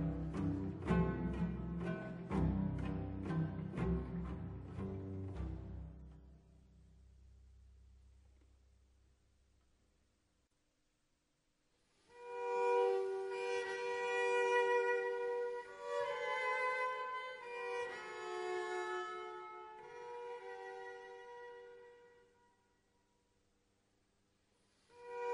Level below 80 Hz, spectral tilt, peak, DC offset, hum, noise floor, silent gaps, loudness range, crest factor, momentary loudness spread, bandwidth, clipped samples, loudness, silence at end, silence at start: -54 dBFS; -6.5 dB/octave; -22 dBFS; under 0.1%; none; -81 dBFS; none; 17 LU; 20 dB; 17 LU; 10.5 kHz; under 0.1%; -40 LUFS; 0 s; 0 s